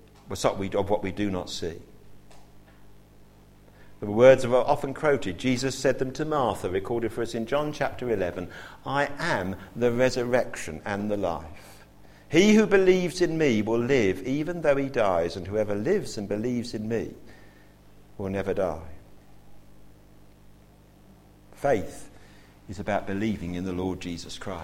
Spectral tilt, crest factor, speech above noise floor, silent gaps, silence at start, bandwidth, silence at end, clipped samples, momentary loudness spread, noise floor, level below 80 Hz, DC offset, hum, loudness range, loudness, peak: -5.5 dB/octave; 22 dB; 28 dB; none; 0.25 s; 16 kHz; 0 s; under 0.1%; 15 LU; -54 dBFS; -50 dBFS; under 0.1%; 50 Hz at -55 dBFS; 12 LU; -26 LUFS; -4 dBFS